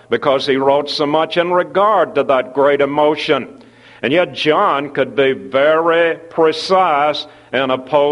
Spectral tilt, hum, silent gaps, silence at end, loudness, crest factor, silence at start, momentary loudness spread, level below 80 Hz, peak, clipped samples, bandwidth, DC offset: -5 dB/octave; none; none; 0 s; -15 LUFS; 14 dB; 0.1 s; 5 LU; -60 dBFS; 0 dBFS; under 0.1%; 11.5 kHz; under 0.1%